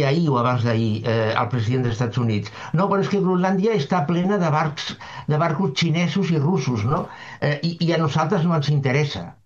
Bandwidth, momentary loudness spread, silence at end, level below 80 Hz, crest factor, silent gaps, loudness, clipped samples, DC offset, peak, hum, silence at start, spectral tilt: 7.4 kHz; 6 LU; 0.15 s; -54 dBFS; 16 dB; none; -21 LUFS; under 0.1%; under 0.1%; -4 dBFS; none; 0 s; -7 dB/octave